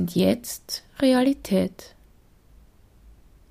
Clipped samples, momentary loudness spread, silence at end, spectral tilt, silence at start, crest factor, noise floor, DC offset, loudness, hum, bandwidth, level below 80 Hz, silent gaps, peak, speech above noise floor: under 0.1%; 13 LU; 1.65 s; -5.5 dB/octave; 0 s; 18 dB; -55 dBFS; under 0.1%; -24 LUFS; none; 15.5 kHz; -54 dBFS; none; -8 dBFS; 32 dB